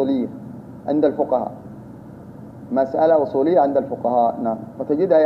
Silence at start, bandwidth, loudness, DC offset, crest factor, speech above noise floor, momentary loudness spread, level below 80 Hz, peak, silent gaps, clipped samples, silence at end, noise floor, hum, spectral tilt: 0 s; 5.8 kHz; -20 LUFS; under 0.1%; 16 dB; 20 dB; 22 LU; -60 dBFS; -4 dBFS; none; under 0.1%; 0 s; -38 dBFS; none; -9.5 dB/octave